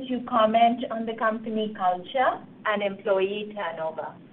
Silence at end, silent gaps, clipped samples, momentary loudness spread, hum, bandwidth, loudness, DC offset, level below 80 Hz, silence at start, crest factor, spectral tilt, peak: 0.05 s; none; under 0.1%; 10 LU; none; 4.2 kHz; -26 LUFS; under 0.1%; -66 dBFS; 0 s; 18 dB; -2.5 dB/octave; -8 dBFS